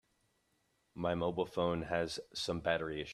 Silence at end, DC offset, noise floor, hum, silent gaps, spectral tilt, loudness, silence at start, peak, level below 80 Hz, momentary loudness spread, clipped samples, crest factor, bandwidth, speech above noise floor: 0 s; under 0.1%; -78 dBFS; none; none; -5 dB/octave; -37 LUFS; 0.95 s; -18 dBFS; -62 dBFS; 5 LU; under 0.1%; 20 dB; 13.5 kHz; 41 dB